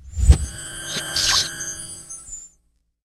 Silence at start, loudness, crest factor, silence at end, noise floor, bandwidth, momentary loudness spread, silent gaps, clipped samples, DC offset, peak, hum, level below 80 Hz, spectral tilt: 0.05 s; -21 LUFS; 22 dB; 0.7 s; -65 dBFS; 15 kHz; 17 LU; none; under 0.1%; under 0.1%; 0 dBFS; none; -26 dBFS; -2.5 dB/octave